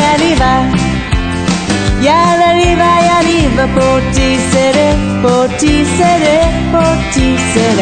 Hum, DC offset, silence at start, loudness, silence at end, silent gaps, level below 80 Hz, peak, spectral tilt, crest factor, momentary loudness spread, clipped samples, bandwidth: none; under 0.1%; 0 s; -10 LUFS; 0 s; none; -22 dBFS; 0 dBFS; -5 dB/octave; 10 dB; 5 LU; under 0.1%; 9.4 kHz